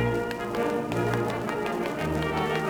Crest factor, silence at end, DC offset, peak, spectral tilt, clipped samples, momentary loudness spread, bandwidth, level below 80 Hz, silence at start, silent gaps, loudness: 16 dB; 0 s; under 0.1%; -12 dBFS; -6 dB/octave; under 0.1%; 2 LU; over 20 kHz; -48 dBFS; 0 s; none; -28 LUFS